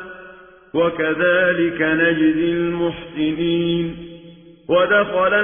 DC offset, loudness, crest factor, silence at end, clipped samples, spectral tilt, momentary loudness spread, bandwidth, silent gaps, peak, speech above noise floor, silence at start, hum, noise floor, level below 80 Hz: under 0.1%; -18 LUFS; 14 dB; 0 s; under 0.1%; -10 dB/octave; 15 LU; 3.6 kHz; none; -4 dBFS; 25 dB; 0 s; none; -43 dBFS; -50 dBFS